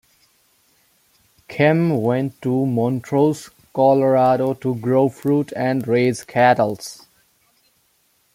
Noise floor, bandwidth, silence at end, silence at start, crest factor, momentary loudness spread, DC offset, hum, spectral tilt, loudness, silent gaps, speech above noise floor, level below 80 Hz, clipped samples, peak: -63 dBFS; 16 kHz; 1.4 s; 1.5 s; 18 dB; 8 LU; under 0.1%; none; -7 dB/octave; -18 LUFS; none; 45 dB; -62 dBFS; under 0.1%; -2 dBFS